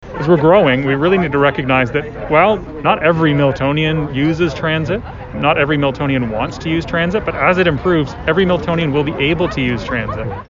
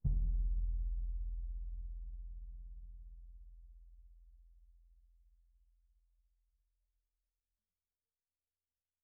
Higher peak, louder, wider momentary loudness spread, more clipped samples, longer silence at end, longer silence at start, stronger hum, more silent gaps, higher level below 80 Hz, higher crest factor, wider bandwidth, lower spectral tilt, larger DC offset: first, 0 dBFS vs -22 dBFS; first, -15 LUFS vs -44 LUFS; second, 7 LU vs 24 LU; neither; second, 0.05 s vs 4.3 s; about the same, 0 s vs 0.05 s; neither; neither; first, -34 dBFS vs -42 dBFS; second, 14 dB vs 20 dB; first, 7.6 kHz vs 0.7 kHz; second, -7.5 dB/octave vs -19.5 dB/octave; neither